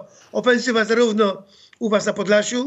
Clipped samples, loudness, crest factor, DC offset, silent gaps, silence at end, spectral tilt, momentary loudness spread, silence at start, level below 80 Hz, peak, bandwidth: under 0.1%; -19 LUFS; 16 dB; under 0.1%; none; 0 s; -4 dB/octave; 10 LU; 0 s; -74 dBFS; -4 dBFS; 8.2 kHz